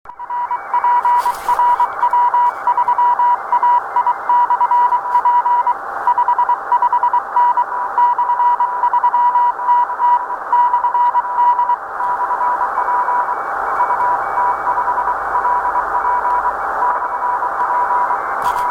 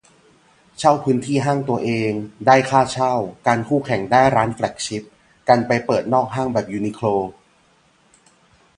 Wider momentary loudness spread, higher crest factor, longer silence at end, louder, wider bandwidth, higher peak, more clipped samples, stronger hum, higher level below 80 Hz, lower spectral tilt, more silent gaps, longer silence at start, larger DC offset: second, 5 LU vs 9 LU; second, 12 dB vs 20 dB; second, 0 s vs 1.45 s; first, -15 LUFS vs -19 LUFS; first, 13.5 kHz vs 11 kHz; second, -4 dBFS vs 0 dBFS; neither; neither; about the same, -52 dBFS vs -54 dBFS; second, -3 dB/octave vs -5.5 dB/octave; neither; second, 0.05 s vs 0.8 s; neither